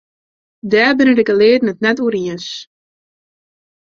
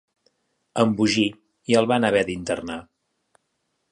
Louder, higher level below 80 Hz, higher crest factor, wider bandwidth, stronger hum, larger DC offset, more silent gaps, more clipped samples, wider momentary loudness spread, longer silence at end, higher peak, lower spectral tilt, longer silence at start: first, -13 LUFS vs -22 LUFS; about the same, -58 dBFS vs -56 dBFS; about the same, 16 dB vs 20 dB; second, 7.4 kHz vs 10.5 kHz; neither; neither; neither; neither; about the same, 16 LU vs 14 LU; first, 1.3 s vs 1.1 s; first, 0 dBFS vs -4 dBFS; about the same, -5.5 dB/octave vs -5 dB/octave; about the same, 0.65 s vs 0.75 s